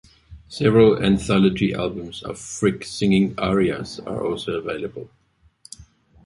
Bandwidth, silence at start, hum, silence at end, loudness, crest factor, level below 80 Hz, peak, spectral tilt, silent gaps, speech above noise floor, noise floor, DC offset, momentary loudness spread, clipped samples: 11.5 kHz; 0.3 s; none; 0.45 s; -21 LUFS; 18 dB; -46 dBFS; -4 dBFS; -6 dB/octave; none; 33 dB; -53 dBFS; under 0.1%; 17 LU; under 0.1%